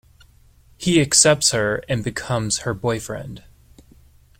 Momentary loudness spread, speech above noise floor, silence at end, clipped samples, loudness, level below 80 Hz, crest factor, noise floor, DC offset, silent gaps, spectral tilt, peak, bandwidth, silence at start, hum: 15 LU; 32 dB; 1 s; under 0.1%; -19 LUFS; -48 dBFS; 22 dB; -52 dBFS; under 0.1%; none; -3 dB/octave; 0 dBFS; 16.5 kHz; 0.8 s; none